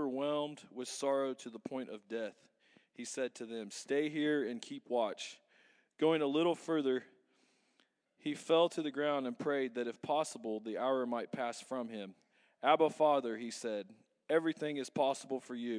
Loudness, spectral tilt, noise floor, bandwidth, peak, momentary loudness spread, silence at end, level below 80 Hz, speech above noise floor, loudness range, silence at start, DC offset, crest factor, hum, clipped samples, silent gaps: -36 LUFS; -4.5 dB/octave; -76 dBFS; 11 kHz; -14 dBFS; 13 LU; 0 s; under -90 dBFS; 40 dB; 5 LU; 0 s; under 0.1%; 22 dB; none; under 0.1%; none